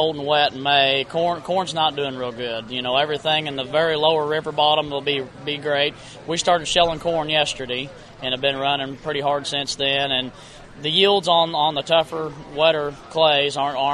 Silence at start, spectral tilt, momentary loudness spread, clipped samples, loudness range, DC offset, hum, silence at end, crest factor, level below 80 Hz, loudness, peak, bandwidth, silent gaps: 0 s; -3.5 dB/octave; 10 LU; under 0.1%; 3 LU; under 0.1%; none; 0 s; 20 dB; -52 dBFS; -20 LUFS; -2 dBFS; 12 kHz; none